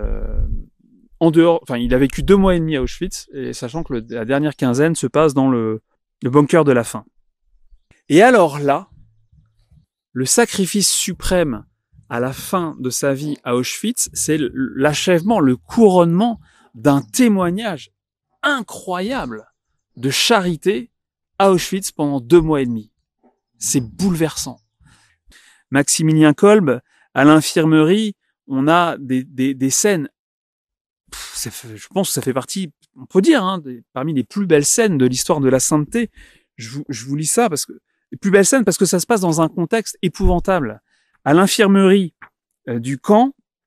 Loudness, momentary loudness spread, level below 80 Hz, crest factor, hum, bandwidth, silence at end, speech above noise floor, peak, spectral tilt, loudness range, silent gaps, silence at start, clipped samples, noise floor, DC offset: -16 LUFS; 14 LU; -34 dBFS; 18 dB; none; 15.5 kHz; 0.35 s; 57 dB; 0 dBFS; -4.5 dB/octave; 5 LU; 30.19-30.65 s, 30.81-30.96 s; 0 s; under 0.1%; -73 dBFS; under 0.1%